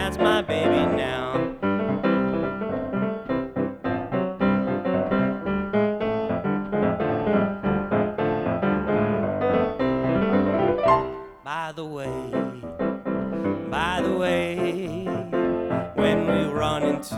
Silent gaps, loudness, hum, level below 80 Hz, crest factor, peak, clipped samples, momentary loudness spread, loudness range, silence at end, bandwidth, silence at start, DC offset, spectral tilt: none; -24 LUFS; none; -46 dBFS; 18 dB; -6 dBFS; under 0.1%; 7 LU; 3 LU; 0 s; 13.5 kHz; 0 s; under 0.1%; -7 dB/octave